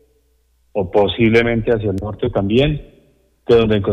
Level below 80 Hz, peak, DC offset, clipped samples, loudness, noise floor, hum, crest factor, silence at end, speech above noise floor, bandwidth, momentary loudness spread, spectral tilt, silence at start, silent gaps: -36 dBFS; -4 dBFS; under 0.1%; under 0.1%; -16 LUFS; -59 dBFS; none; 14 dB; 0 s; 44 dB; 8.2 kHz; 11 LU; -8 dB/octave; 0.75 s; none